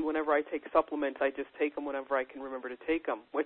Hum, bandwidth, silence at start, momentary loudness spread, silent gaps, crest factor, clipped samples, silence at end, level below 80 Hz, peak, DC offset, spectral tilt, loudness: none; 4.3 kHz; 0 s; 9 LU; none; 20 dB; under 0.1%; 0 s; -64 dBFS; -12 dBFS; under 0.1%; -7.5 dB/octave; -33 LUFS